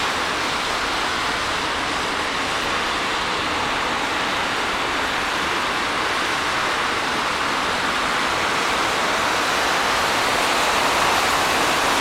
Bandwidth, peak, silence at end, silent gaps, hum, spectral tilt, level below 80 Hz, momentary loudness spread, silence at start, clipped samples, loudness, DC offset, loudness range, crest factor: 16.5 kHz; -6 dBFS; 0 s; none; none; -2 dB/octave; -44 dBFS; 4 LU; 0 s; under 0.1%; -20 LUFS; under 0.1%; 3 LU; 16 dB